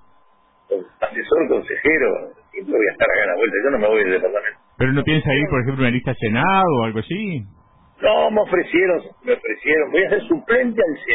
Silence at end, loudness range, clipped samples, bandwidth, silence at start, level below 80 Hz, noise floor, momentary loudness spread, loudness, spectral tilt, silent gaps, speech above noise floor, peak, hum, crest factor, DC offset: 0 s; 1 LU; under 0.1%; 4 kHz; 0.7 s; -48 dBFS; -56 dBFS; 9 LU; -19 LUFS; -10.5 dB/octave; none; 38 dB; -4 dBFS; none; 14 dB; under 0.1%